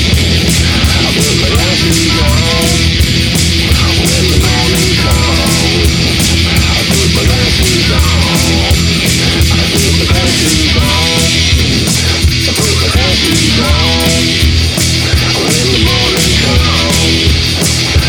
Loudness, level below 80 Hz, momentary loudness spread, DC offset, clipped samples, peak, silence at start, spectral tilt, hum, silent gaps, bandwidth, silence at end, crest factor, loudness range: -9 LUFS; -16 dBFS; 1 LU; under 0.1%; under 0.1%; 0 dBFS; 0 s; -3.5 dB/octave; none; none; 20 kHz; 0 s; 10 dB; 0 LU